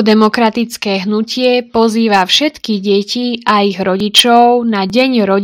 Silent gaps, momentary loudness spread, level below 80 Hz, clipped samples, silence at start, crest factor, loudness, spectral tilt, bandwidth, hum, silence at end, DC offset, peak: none; 8 LU; -52 dBFS; 0.4%; 0 s; 12 dB; -11 LUFS; -4 dB/octave; over 20 kHz; none; 0 s; under 0.1%; 0 dBFS